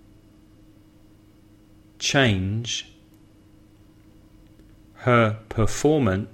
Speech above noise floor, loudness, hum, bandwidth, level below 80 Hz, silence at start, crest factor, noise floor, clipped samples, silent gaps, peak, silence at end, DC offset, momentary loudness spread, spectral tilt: 31 dB; -22 LUFS; none; 14 kHz; -44 dBFS; 2 s; 20 dB; -53 dBFS; under 0.1%; none; -6 dBFS; 0.05 s; under 0.1%; 9 LU; -5 dB/octave